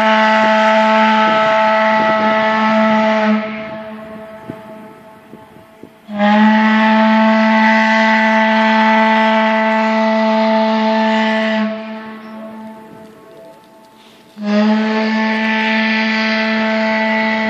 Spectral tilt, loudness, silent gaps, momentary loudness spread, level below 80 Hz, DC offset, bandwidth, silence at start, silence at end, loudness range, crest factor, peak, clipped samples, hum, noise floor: -5.5 dB/octave; -13 LUFS; none; 19 LU; -62 dBFS; under 0.1%; 7.6 kHz; 0 s; 0 s; 10 LU; 14 dB; 0 dBFS; under 0.1%; none; -43 dBFS